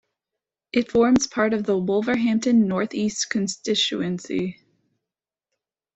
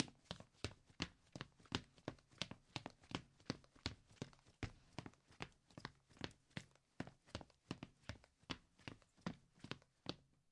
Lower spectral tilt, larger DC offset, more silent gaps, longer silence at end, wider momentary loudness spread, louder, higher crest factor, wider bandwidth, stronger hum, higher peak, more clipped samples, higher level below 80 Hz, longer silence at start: about the same, -4.5 dB/octave vs -4.5 dB/octave; neither; neither; first, 1.45 s vs 0.3 s; about the same, 8 LU vs 9 LU; first, -22 LUFS vs -54 LUFS; second, 16 dB vs 36 dB; second, 8.4 kHz vs 11 kHz; neither; first, -8 dBFS vs -18 dBFS; neither; first, -58 dBFS vs -70 dBFS; first, 0.75 s vs 0 s